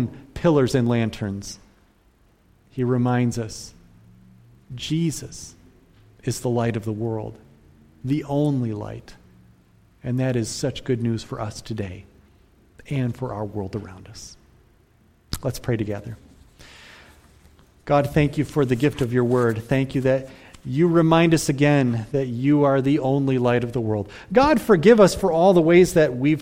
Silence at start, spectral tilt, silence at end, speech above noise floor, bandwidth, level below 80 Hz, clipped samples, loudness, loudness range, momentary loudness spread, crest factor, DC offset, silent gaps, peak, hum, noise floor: 0 s; -6.5 dB/octave; 0 s; 38 dB; 16.5 kHz; -48 dBFS; under 0.1%; -21 LUFS; 13 LU; 21 LU; 20 dB; under 0.1%; none; -2 dBFS; none; -58 dBFS